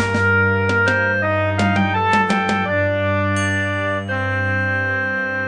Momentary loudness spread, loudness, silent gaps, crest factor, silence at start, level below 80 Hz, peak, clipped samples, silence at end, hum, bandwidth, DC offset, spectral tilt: 4 LU; -18 LUFS; none; 14 dB; 0 s; -54 dBFS; -4 dBFS; under 0.1%; 0 s; none; 10 kHz; under 0.1%; -6 dB/octave